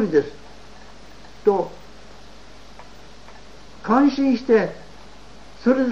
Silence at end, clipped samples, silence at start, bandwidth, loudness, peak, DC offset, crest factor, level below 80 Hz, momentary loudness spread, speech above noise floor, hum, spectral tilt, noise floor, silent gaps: 0 s; under 0.1%; 0 s; 8 kHz; -20 LUFS; -4 dBFS; 0.9%; 20 dB; -50 dBFS; 26 LU; 27 dB; none; -6.5 dB/octave; -45 dBFS; none